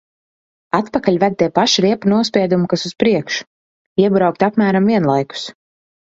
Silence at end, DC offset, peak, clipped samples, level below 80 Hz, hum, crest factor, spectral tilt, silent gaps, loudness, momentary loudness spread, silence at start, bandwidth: 0.5 s; under 0.1%; 0 dBFS; under 0.1%; -56 dBFS; none; 16 dB; -5.5 dB/octave; 3.47-3.96 s; -16 LUFS; 9 LU; 0.75 s; 7.8 kHz